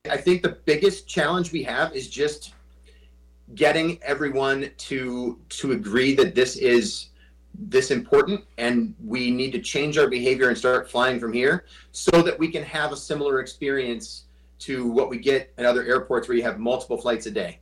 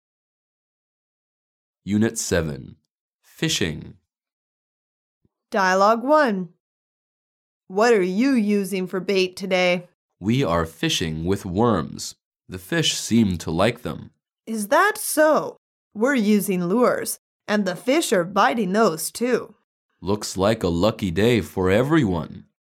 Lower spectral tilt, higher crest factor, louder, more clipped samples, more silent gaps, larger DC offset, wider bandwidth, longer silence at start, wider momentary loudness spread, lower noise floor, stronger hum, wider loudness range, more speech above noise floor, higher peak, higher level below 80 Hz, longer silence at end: about the same, -4.5 dB/octave vs -4.5 dB/octave; about the same, 14 dB vs 18 dB; about the same, -23 LUFS vs -21 LUFS; neither; second, none vs 3.01-3.09 s, 4.32-5.21 s, 6.60-7.61 s, 9.94-10.09 s, 12.25-12.32 s, 15.57-15.91 s, 17.18-17.40 s, 19.64-19.89 s; neither; second, 12.5 kHz vs 17.5 kHz; second, 0.05 s vs 1.85 s; second, 10 LU vs 13 LU; second, -52 dBFS vs under -90 dBFS; neither; about the same, 4 LU vs 5 LU; second, 29 dB vs over 69 dB; second, -10 dBFS vs -4 dBFS; about the same, -52 dBFS vs -50 dBFS; second, 0.05 s vs 0.4 s